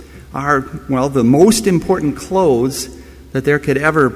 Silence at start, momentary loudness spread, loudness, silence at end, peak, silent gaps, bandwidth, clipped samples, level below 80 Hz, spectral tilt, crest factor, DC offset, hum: 0 s; 13 LU; -15 LUFS; 0 s; 0 dBFS; none; 16 kHz; under 0.1%; -38 dBFS; -5.5 dB/octave; 14 dB; under 0.1%; none